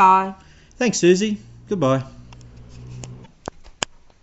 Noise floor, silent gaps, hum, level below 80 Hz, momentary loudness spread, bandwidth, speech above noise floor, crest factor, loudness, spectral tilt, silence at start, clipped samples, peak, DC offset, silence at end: -42 dBFS; none; none; -48 dBFS; 22 LU; 8 kHz; 25 dB; 20 dB; -20 LUFS; -4.5 dB/octave; 0 s; under 0.1%; 0 dBFS; under 0.1%; 1.05 s